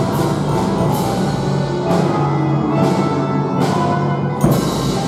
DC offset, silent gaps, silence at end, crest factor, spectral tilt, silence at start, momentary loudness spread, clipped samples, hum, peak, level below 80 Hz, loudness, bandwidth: under 0.1%; none; 0 s; 16 dB; -7 dB/octave; 0 s; 3 LU; under 0.1%; none; 0 dBFS; -40 dBFS; -17 LUFS; 15.5 kHz